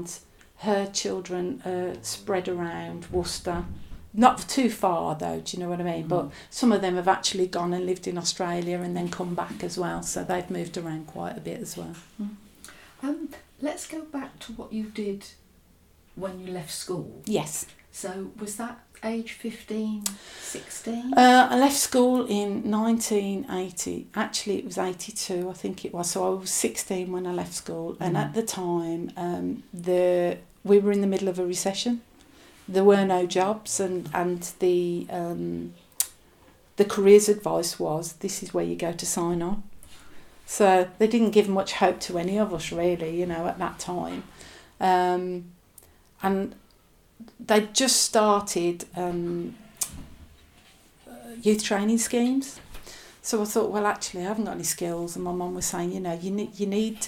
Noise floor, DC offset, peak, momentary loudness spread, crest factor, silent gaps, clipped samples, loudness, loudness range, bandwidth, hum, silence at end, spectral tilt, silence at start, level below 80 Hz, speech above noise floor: -59 dBFS; under 0.1%; -2 dBFS; 15 LU; 24 dB; none; under 0.1%; -26 LUFS; 10 LU; 19 kHz; none; 0 s; -4 dB/octave; 0 s; -54 dBFS; 33 dB